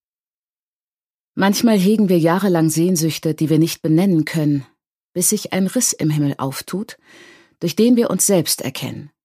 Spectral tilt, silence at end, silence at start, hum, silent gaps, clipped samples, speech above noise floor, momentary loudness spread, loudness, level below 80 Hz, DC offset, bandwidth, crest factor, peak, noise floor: -5 dB/octave; 0.2 s; 1.35 s; none; 5.04-5.13 s; under 0.1%; over 73 dB; 11 LU; -17 LUFS; -64 dBFS; under 0.1%; 15.5 kHz; 16 dB; -2 dBFS; under -90 dBFS